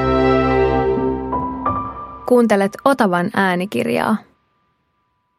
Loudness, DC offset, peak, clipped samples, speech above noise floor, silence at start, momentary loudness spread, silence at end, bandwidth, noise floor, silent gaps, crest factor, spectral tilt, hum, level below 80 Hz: -17 LUFS; under 0.1%; 0 dBFS; under 0.1%; 50 dB; 0 s; 8 LU; 1.15 s; 15.5 kHz; -66 dBFS; none; 18 dB; -6.5 dB/octave; none; -36 dBFS